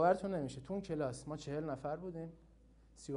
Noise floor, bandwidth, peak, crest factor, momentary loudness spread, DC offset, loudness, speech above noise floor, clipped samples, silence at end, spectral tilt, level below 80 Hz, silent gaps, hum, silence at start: -64 dBFS; 10.5 kHz; -18 dBFS; 22 dB; 11 LU; under 0.1%; -41 LUFS; 25 dB; under 0.1%; 0 s; -6.5 dB/octave; -64 dBFS; none; none; 0 s